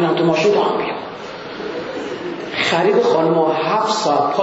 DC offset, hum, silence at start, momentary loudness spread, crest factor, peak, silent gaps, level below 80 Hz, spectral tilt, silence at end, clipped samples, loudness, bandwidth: under 0.1%; none; 0 s; 13 LU; 14 dB; -2 dBFS; none; -60 dBFS; -5 dB/octave; 0 s; under 0.1%; -17 LUFS; 8 kHz